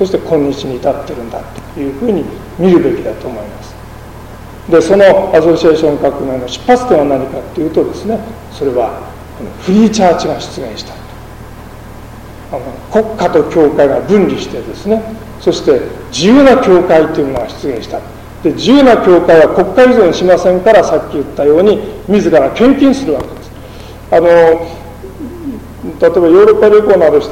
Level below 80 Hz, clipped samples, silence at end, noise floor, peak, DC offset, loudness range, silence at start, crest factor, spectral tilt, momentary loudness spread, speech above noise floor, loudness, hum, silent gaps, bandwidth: -34 dBFS; under 0.1%; 0 s; -29 dBFS; 0 dBFS; under 0.1%; 7 LU; 0 s; 10 dB; -6 dB/octave; 23 LU; 20 dB; -10 LUFS; none; none; 16.5 kHz